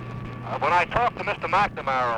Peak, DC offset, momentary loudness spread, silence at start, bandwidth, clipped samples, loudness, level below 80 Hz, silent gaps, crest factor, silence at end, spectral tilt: -8 dBFS; under 0.1%; 12 LU; 0 s; 11 kHz; under 0.1%; -24 LUFS; -48 dBFS; none; 18 dB; 0 s; -5.5 dB/octave